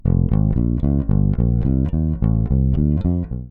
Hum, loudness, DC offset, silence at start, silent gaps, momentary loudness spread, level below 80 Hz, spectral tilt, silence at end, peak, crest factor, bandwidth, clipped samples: none; -19 LUFS; under 0.1%; 0.05 s; none; 3 LU; -22 dBFS; -13.5 dB/octave; 0 s; -4 dBFS; 12 dB; 3.7 kHz; under 0.1%